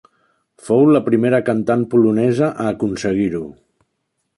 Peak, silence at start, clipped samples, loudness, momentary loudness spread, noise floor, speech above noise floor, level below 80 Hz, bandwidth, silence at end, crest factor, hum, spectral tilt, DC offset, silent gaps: -4 dBFS; 0.65 s; under 0.1%; -16 LUFS; 8 LU; -72 dBFS; 56 dB; -52 dBFS; 11.5 kHz; 0.85 s; 14 dB; none; -7.5 dB/octave; under 0.1%; none